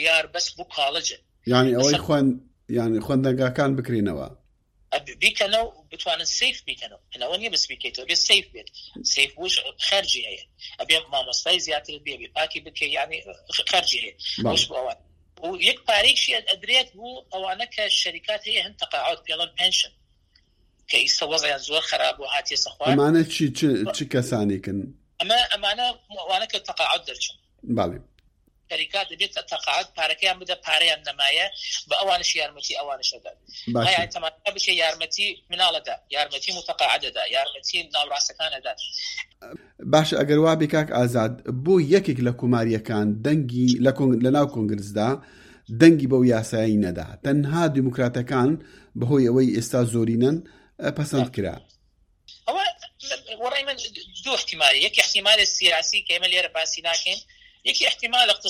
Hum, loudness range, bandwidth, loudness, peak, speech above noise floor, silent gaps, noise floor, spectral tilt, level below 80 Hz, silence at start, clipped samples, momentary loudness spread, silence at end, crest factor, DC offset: none; 4 LU; 15.5 kHz; -22 LUFS; 0 dBFS; 40 dB; none; -63 dBFS; -3.5 dB/octave; -56 dBFS; 0 s; under 0.1%; 12 LU; 0 s; 24 dB; under 0.1%